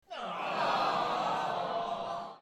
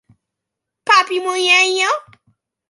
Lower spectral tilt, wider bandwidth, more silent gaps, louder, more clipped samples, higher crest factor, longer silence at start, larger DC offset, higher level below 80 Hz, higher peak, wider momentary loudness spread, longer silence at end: first, -4 dB/octave vs 0 dB/octave; first, 13.5 kHz vs 11.5 kHz; neither; second, -33 LUFS vs -14 LUFS; neither; about the same, 16 dB vs 18 dB; second, 0.1 s vs 0.85 s; neither; about the same, -70 dBFS vs -72 dBFS; second, -18 dBFS vs 0 dBFS; second, 8 LU vs 11 LU; second, 0 s vs 0.7 s